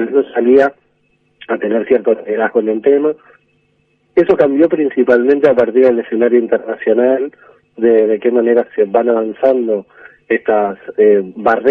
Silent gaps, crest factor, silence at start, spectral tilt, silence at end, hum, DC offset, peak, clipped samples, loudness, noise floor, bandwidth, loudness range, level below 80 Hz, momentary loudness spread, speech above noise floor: none; 12 dB; 0 s; -8.5 dB/octave; 0 s; none; under 0.1%; 0 dBFS; under 0.1%; -13 LUFS; -59 dBFS; 4.7 kHz; 3 LU; -58 dBFS; 7 LU; 47 dB